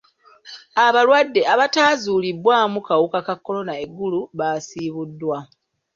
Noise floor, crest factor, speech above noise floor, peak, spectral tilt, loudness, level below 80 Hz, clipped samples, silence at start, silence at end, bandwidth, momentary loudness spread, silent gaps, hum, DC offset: -46 dBFS; 18 dB; 28 dB; -2 dBFS; -4 dB/octave; -19 LUFS; -66 dBFS; under 0.1%; 0.45 s; 0.5 s; 7.6 kHz; 13 LU; none; none; under 0.1%